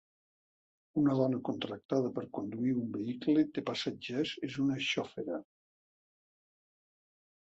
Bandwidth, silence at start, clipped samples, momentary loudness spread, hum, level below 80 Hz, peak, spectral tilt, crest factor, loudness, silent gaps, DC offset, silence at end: 8 kHz; 0.95 s; under 0.1%; 9 LU; none; -74 dBFS; -16 dBFS; -6 dB/octave; 18 dB; -34 LUFS; 1.85-1.89 s; under 0.1%; 2.15 s